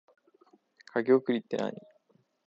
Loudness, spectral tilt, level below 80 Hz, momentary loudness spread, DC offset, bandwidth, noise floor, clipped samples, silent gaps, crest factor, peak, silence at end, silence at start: -29 LUFS; -7 dB/octave; -82 dBFS; 11 LU; under 0.1%; 7.6 kHz; -69 dBFS; under 0.1%; none; 20 dB; -12 dBFS; 0.65 s; 0.95 s